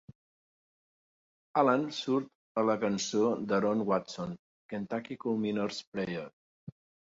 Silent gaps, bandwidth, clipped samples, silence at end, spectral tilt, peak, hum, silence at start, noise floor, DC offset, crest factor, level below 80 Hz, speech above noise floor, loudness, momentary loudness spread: 2.35-2.55 s, 4.39-4.69 s, 5.87-5.92 s, 6.33-6.67 s; 7.8 kHz; under 0.1%; 0.35 s; -5 dB/octave; -12 dBFS; none; 1.55 s; under -90 dBFS; under 0.1%; 22 dB; -72 dBFS; over 59 dB; -32 LUFS; 17 LU